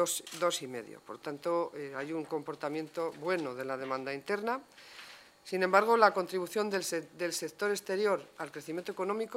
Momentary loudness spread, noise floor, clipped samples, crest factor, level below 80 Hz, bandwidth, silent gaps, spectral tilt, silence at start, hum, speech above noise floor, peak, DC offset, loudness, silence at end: 16 LU; -53 dBFS; under 0.1%; 24 dB; -82 dBFS; 16 kHz; none; -3.5 dB/octave; 0 s; none; 20 dB; -10 dBFS; under 0.1%; -33 LUFS; 0 s